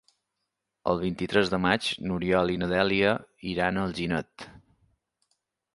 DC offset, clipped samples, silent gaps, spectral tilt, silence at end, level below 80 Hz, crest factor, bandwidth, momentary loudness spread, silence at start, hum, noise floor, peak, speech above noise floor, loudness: under 0.1%; under 0.1%; none; -6 dB/octave; 1.15 s; -52 dBFS; 24 dB; 11.5 kHz; 10 LU; 0.85 s; none; -83 dBFS; -6 dBFS; 56 dB; -27 LUFS